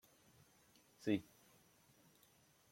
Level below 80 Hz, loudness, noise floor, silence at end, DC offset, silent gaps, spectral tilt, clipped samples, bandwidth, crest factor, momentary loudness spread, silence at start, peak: -84 dBFS; -43 LUFS; -72 dBFS; 1.5 s; under 0.1%; none; -6 dB/octave; under 0.1%; 16.5 kHz; 24 dB; 27 LU; 1 s; -24 dBFS